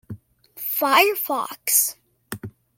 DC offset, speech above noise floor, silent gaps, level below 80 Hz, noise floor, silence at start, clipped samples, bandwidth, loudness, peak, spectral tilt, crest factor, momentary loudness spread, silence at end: under 0.1%; 22 dB; none; -64 dBFS; -42 dBFS; 0.1 s; under 0.1%; 17 kHz; -20 LUFS; -2 dBFS; -1.5 dB/octave; 22 dB; 21 LU; 0.3 s